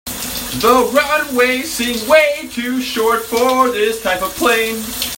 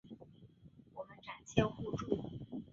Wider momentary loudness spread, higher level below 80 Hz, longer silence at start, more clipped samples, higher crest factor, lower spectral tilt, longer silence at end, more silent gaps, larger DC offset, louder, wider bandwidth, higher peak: second, 9 LU vs 24 LU; first, -44 dBFS vs -60 dBFS; about the same, 0.05 s vs 0.05 s; neither; second, 16 dB vs 28 dB; second, -2.5 dB/octave vs -6 dB/octave; about the same, 0 s vs 0.05 s; neither; neither; first, -15 LUFS vs -39 LUFS; first, 16.5 kHz vs 7.4 kHz; first, 0 dBFS vs -12 dBFS